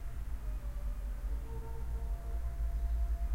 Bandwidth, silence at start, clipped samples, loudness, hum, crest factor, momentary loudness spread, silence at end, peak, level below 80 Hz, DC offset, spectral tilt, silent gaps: 15.5 kHz; 0 s; under 0.1%; -41 LUFS; none; 12 dB; 6 LU; 0 s; -24 dBFS; -36 dBFS; under 0.1%; -7 dB/octave; none